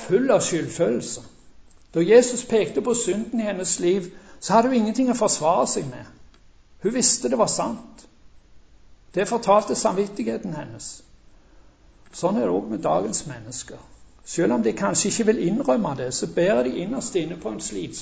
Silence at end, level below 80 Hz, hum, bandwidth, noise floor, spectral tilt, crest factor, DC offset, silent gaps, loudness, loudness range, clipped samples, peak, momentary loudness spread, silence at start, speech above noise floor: 0 s; -54 dBFS; none; 8 kHz; -51 dBFS; -4 dB/octave; 20 dB; under 0.1%; none; -22 LUFS; 6 LU; under 0.1%; -2 dBFS; 14 LU; 0 s; 29 dB